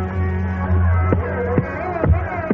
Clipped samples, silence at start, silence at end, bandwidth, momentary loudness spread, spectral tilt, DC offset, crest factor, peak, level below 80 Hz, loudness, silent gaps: under 0.1%; 0 s; 0 s; 3.4 kHz; 5 LU; -9 dB/octave; under 0.1%; 16 dB; -2 dBFS; -30 dBFS; -20 LUFS; none